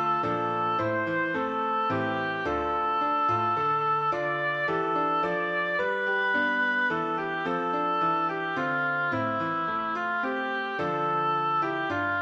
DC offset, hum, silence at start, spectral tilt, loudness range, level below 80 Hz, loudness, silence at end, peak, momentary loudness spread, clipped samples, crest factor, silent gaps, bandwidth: under 0.1%; none; 0 s; -6.5 dB/octave; 2 LU; -60 dBFS; -27 LUFS; 0 s; -16 dBFS; 4 LU; under 0.1%; 10 dB; none; 7.8 kHz